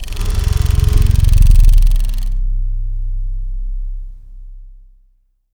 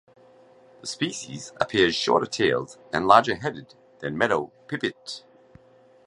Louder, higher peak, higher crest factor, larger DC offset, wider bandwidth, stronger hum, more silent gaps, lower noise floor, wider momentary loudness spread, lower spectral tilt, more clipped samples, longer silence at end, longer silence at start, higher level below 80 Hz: first, -17 LUFS vs -24 LUFS; about the same, 0 dBFS vs -2 dBFS; second, 12 dB vs 24 dB; neither; first, 16.5 kHz vs 11.5 kHz; neither; neither; about the same, -55 dBFS vs -55 dBFS; second, 15 LU vs 19 LU; first, -5.5 dB/octave vs -4 dB/octave; first, 0.3% vs under 0.1%; about the same, 0.8 s vs 0.9 s; second, 0 s vs 0.85 s; first, -14 dBFS vs -60 dBFS